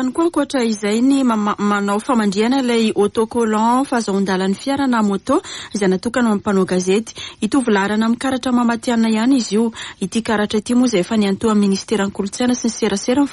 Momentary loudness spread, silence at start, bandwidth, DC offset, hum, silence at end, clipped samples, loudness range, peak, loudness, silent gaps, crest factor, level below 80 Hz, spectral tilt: 4 LU; 0 s; 11.5 kHz; under 0.1%; none; 0 s; under 0.1%; 1 LU; -4 dBFS; -17 LUFS; none; 14 dB; -52 dBFS; -5 dB/octave